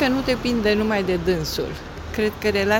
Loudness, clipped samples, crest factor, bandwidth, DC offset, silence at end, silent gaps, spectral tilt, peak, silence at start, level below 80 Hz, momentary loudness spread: -22 LUFS; under 0.1%; 16 dB; 17 kHz; under 0.1%; 0 s; none; -5 dB/octave; -6 dBFS; 0 s; -38 dBFS; 9 LU